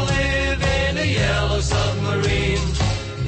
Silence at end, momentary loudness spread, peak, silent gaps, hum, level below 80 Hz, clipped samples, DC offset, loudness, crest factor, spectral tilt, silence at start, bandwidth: 0 s; 2 LU; -8 dBFS; none; none; -26 dBFS; under 0.1%; under 0.1%; -20 LUFS; 12 dB; -5 dB/octave; 0 s; 8.8 kHz